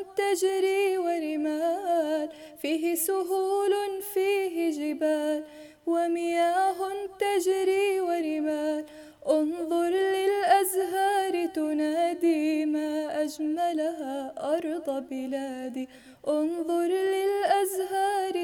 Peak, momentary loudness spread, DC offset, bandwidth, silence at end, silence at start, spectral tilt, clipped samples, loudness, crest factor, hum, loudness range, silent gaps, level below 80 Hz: -8 dBFS; 8 LU; under 0.1%; 19 kHz; 0 s; 0 s; -2.5 dB/octave; under 0.1%; -27 LUFS; 18 dB; none; 4 LU; none; -72 dBFS